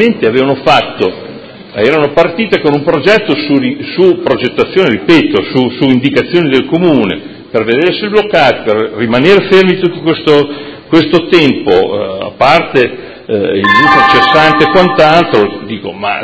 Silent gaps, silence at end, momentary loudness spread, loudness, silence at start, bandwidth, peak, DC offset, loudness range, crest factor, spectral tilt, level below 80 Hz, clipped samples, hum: none; 0 s; 10 LU; -9 LUFS; 0 s; 8 kHz; 0 dBFS; under 0.1%; 3 LU; 10 dB; -6.5 dB/octave; -42 dBFS; 2%; none